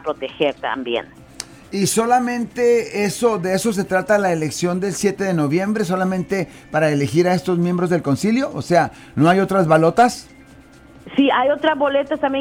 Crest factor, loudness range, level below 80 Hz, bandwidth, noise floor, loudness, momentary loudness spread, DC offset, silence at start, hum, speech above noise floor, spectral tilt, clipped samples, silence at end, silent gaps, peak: 14 dB; 2 LU; -52 dBFS; 19.5 kHz; -45 dBFS; -18 LUFS; 8 LU; under 0.1%; 0.05 s; none; 27 dB; -5.5 dB/octave; under 0.1%; 0 s; none; -4 dBFS